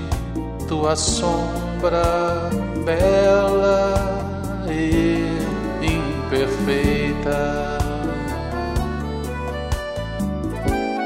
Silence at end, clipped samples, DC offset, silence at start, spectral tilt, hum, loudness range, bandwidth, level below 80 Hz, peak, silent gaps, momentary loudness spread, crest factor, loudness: 0 s; under 0.1%; under 0.1%; 0 s; -5.5 dB/octave; none; 6 LU; 16 kHz; -30 dBFS; -6 dBFS; none; 9 LU; 16 dB; -21 LUFS